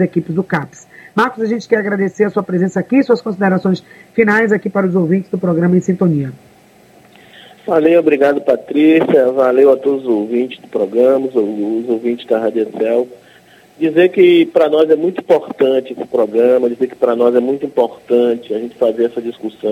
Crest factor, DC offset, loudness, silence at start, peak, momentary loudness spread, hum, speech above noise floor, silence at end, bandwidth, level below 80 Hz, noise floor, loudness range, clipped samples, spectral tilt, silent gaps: 14 dB; under 0.1%; -14 LUFS; 0 s; 0 dBFS; 9 LU; none; 32 dB; 0 s; 12.5 kHz; -62 dBFS; -46 dBFS; 4 LU; under 0.1%; -7.5 dB/octave; none